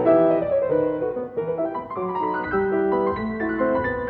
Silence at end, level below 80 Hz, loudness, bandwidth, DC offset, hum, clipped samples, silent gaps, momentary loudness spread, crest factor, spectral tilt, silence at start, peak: 0 s; -50 dBFS; -23 LUFS; 4.7 kHz; under 0.1%; none; under 0.1%; none; 8 LU; 16 dB; -10.5 dB/octave; 0 s; -6 dBFS